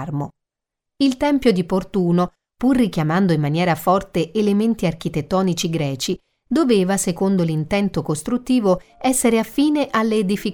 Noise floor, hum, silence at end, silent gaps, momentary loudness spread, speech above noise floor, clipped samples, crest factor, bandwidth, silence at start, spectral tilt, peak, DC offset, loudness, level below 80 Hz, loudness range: -83 dBFS; none; 0 s; none; 6 LU; 64 dB; under 0.1%; 16 dB; 19.5 kHz; 0 s; -5.5 dB/octave; -4 dBFS; under 0.1%; -19 LUFS; -46 dBFS; 1 LU